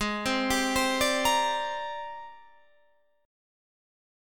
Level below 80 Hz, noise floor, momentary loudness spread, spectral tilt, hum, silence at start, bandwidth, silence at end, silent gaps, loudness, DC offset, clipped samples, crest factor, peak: -52 dBFS; -68 dBFS; 16 LU; -2 dB/octave; none; 0 s; 17.5 kHz; 1 s; none; -27 LUFS; 0.3%; under 0.1%; 18 dB; -12 dBFS